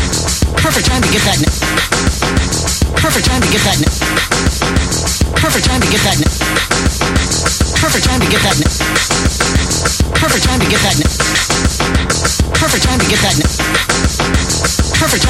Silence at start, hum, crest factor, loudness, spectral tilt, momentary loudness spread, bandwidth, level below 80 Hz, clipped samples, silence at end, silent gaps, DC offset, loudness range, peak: 0 s; none; 12 dB; -12 LUFS; -3.5 dB/octave; 3 LU; 16.5 kHz; -20 dBFS; under 0.1%; 0 s; none; under 0.1%; 1 LU; 0 dBFS